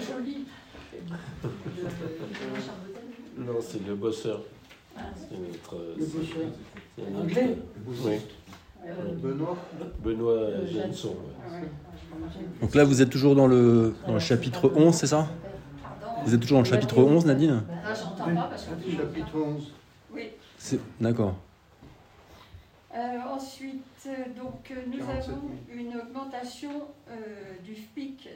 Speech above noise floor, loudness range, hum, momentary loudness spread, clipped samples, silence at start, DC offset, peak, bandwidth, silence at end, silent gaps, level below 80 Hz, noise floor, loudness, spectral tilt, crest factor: 26 dB; 15 LU; none; 22 LU; under 0.1%; 0 s; under 0.1%; -6 dBFS; 16 kHz; 0 s; none; -54 dBFS; -53 dBFS; -27 LUFS; -6.5 dB/octave; 22 dB